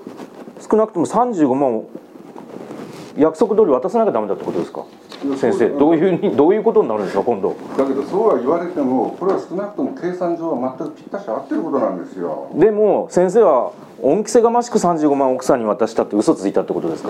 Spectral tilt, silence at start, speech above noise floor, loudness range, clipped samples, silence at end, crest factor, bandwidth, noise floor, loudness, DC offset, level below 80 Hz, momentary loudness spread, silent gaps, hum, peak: -6.5 dB/octave; 0 s; 20 dB; 5 LU; under 0.1%; 0 s; 16 dB; 12.5 kHz; -37 dBFS; -17 LUFS; under 0.1%; -58 dBFS; 15 LU; none; none; 0 dBFS